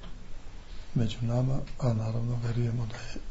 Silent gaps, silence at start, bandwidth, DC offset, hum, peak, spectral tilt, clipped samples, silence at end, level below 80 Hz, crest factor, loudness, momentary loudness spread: none; 0 s; 8 kHz; under 0.1%; none; -16 dBFS; -7.5 dB/octave; under 0.1%; 0 s; -40 dBFS; 14 dB; -31 LUFS; 19 LU